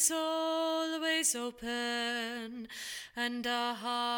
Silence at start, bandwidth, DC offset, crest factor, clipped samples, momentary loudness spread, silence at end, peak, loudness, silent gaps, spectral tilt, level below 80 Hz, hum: 0 s; 18 kHz; under 0.1%; 18 dB; under 0.1%; 11 LU; 0 s; -16 dBFS; -33 LUFS; none; -0.5 dB/octave; -70 dBFS; none